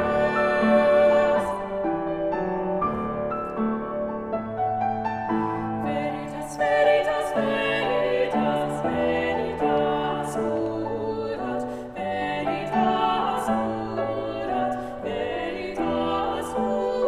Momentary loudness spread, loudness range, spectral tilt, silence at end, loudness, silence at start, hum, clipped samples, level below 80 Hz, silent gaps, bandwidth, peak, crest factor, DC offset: 9 LU; 4 LU; -6 dB/octave; 0 s; -25 LUFS; 0 s; none; under 0.1%; -50 dBFS; none; 13 kHz; -8 dBFS; 16 dB; under 0.1%